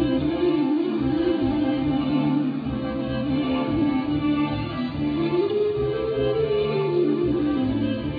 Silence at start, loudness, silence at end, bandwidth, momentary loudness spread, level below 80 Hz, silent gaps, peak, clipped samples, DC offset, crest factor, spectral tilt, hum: 0 s; -23 LUFS; 0 s; 5 kHz; 4 LU; -44 dBFS; none; -12 dBFS; under 0.1%; under 0.1%; 12 dB; -10 dB/octave; none